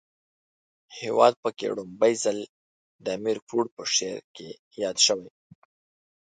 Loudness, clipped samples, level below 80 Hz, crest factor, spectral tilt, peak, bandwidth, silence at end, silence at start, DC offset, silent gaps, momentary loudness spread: -25 LUFS; under 0.1%; -74 dBFS; 24 dB; -2 dB/octave; -4 dBFS; 11 kHz; 1 s; 0.9 s; under 0.1%; 1.37-1.43 s, 2.49-2.99 s, 3.42-3.47 s, 3.71-3.77 s, 4.24-4.34 s, 4.59-4.71 s; 20 LU